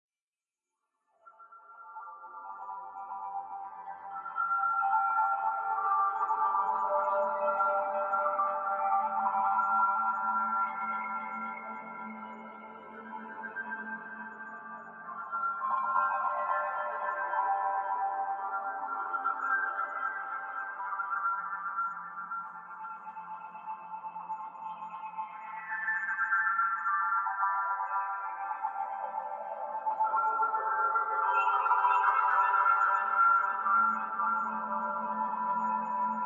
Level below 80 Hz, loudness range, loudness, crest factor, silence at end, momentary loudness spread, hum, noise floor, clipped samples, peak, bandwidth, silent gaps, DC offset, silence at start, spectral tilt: under -90 dBFS; 14 LU; -31 LUFS; 18 dB; 0 s; 16 LU; none; under -90 dBFS; under 0.1%; -14 dBFS; 7.2 kHz; none; under 0.1%; 1.25 s; -5.5 dB/octave